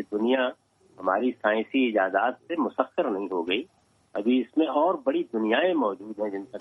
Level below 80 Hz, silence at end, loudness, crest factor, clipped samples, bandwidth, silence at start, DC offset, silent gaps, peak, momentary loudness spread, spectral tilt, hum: -74 dBFS; 0 s; -26 LUFS; 18 dB; under 0.1%; 5.8 kHz; 0 s; under 0.1%; none; -8 dBFS; 8 LU; -6.5 dB/octave; none